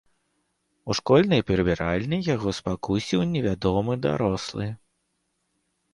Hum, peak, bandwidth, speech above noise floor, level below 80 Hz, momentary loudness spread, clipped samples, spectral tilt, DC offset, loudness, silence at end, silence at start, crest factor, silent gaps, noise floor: none; -6 dBFS; 11.5 kHz; 51 dB; -46 dBFS; 11 LU; under 0.1%; -6.5 dB/octave; under 0.1%; -24 LUFS; 1.2 s; 0.85 s; 18 dB; none; -75 dBFS